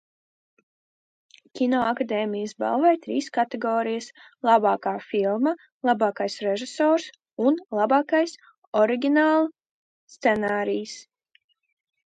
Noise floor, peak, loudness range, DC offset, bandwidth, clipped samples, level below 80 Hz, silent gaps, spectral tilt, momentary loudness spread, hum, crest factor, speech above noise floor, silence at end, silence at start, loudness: under -90 dBFS; -6 dBFS; 3 LU; under 0.1%; 9.2 kHz; under 0.1%; -70 dBFS; 5.72-5.80 s, 7.33-7.37 s, 8.58-8.72 s, 9.71-10.08 s; -5 dB/octave; 9 LU; none; 18 dB; over 67 dB; 1.05 s; 1.55 s; -24 LUFS